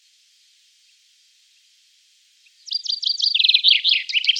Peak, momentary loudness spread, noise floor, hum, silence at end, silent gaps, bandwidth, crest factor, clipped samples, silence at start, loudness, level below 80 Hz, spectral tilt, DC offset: -2 dBFS; 12 LU; -58 dBFS; none; 0 s; none; 13.5 kHz; 20 dB; under 0.1%; 2.65 s; -16 LUFS; under -90 dBFS; 12.5 dB/octave; under 0.1%